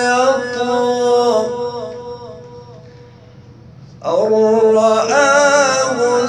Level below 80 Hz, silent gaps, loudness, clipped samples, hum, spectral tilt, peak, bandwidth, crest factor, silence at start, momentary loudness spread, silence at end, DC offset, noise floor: -56 dBFS; none; -14 LUFS; under 0.1%; none; -3 dB/octave; 0 dBFS; 10.5 kHz; 14 dB; 0 s; 18 LU; 0 s; under 0.1%; -40 dBFS